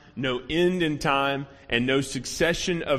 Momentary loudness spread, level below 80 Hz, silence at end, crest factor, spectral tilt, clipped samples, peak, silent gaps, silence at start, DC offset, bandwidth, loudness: 6 LU; -48 dBFS; 0 s; 18 dB; -4.5 dB/octave; under 0.1%; -6 dBFS; none; 0.15 s; under 0.1%; 15.5 kHz; -25 LUFS